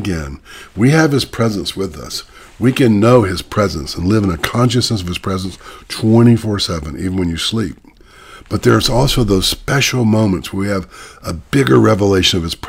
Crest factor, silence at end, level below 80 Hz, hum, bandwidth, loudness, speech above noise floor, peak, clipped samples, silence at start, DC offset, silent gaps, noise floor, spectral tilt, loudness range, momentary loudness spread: 14 dB; 0 s; -32 dBFS; none; 16.5 kHz; -14 LUFS; 26 dB; 0 dBFS; under 0.1%; 0 s; under 0.1%; none; -40 dBFS; -5.5 dB/octave; 2 LU; 15 LU